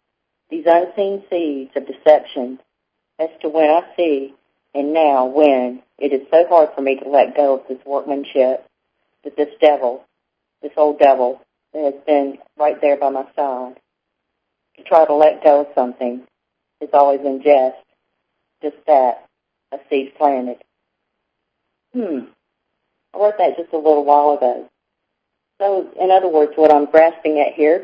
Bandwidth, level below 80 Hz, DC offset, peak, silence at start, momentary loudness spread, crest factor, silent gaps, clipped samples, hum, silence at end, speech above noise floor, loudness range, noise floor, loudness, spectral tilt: 5.2 kHz; -72 dBFS; under 0.1%; 0 dBFS; 0.5 s; 16 LU; 18 dB; none; under 0.1%; none; 0 s; 60 dB; 5 LU; -76 dBFS; -16 LUFS; -6.5 dB/octave